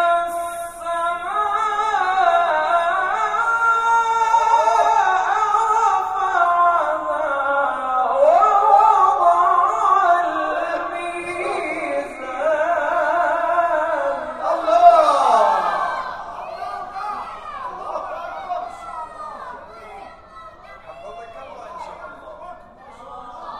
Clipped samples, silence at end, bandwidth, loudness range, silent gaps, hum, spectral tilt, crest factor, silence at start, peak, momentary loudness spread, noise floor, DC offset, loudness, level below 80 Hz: under 0.1%; 0 s; 13 kHz; 18 LU; none; none; -2.5 dB/octave; 18 dB; 0 s; 0 dBFS; 21 LU; -42 dBFS; under 0.1%; -18 LUFS; -54 dBFS